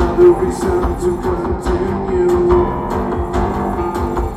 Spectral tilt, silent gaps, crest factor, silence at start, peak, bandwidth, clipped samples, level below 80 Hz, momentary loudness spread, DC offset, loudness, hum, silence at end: -8 dB/octave; none; 14 dB; 0 s; -2 dBFS; 14 kHz; under 0.1%; -26 dBFS; 8 LU; under 0.1%; -16 LUFS; none; 0 s